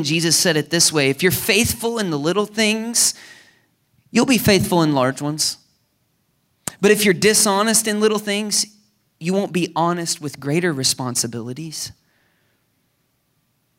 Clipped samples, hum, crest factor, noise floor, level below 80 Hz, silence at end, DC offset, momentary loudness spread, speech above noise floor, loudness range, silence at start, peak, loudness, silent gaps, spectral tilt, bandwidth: under 0.1%; none; 18 dB; -67 dBFS; -54 dBFS; 1.9 s; under 0.1%; 13 LU; 48 dB; 5 LU; 0 s; -2 dBFS; -18 LUFS; none; -3 dB/octave; 16 kHz